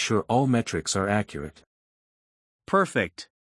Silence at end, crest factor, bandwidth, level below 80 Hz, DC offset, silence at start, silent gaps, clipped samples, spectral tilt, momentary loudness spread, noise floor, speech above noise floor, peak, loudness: 0.3 s; 20 dB; 12 kHz; -58 dBFS; under 0.1%; 0 s; 1.66-2.59 s; under 0.1%; -5 dB/octave; 14 LU; under -90 dBFS; over 65 dB; -8 dBFS; -25 LUFS